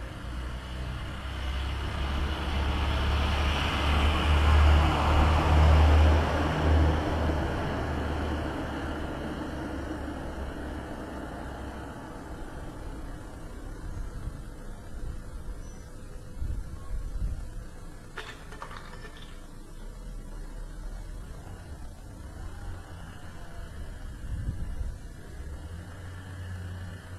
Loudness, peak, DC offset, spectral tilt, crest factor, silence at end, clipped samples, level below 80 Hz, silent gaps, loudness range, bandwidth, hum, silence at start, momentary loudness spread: -29 LUFS; -10 dBFS; under 0.1%; -6.5 dB/octave; 18 dB; 0 s; under 0.1%; -32 dBFS; none; 20 LU; 12 kHz; none; 0 s; 21 LU